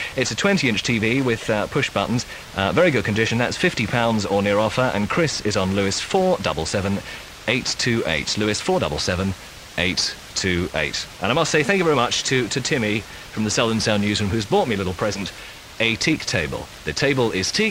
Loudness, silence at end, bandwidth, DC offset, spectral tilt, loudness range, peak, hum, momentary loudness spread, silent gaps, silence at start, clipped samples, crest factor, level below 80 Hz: -21 LUFS; 0 s; 16 kHz; under 0.1%; -4 dB/octave; 2 LU; -2 dBFS; none; 8 LU; none; 0 s; under 0.1%; 18 dB; -44 dBFS